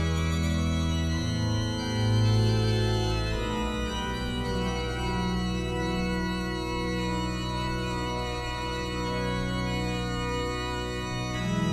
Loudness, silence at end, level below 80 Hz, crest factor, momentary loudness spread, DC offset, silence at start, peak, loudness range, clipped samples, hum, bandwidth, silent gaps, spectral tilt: -29 LUFS; 0 s; -36 dBFS; 14 dB; 6 LU; under 0.1%; 0 s; -14 dBFS; 4 LU; under 0.1%; none; 14 kHz; none; -5.5 dB/octave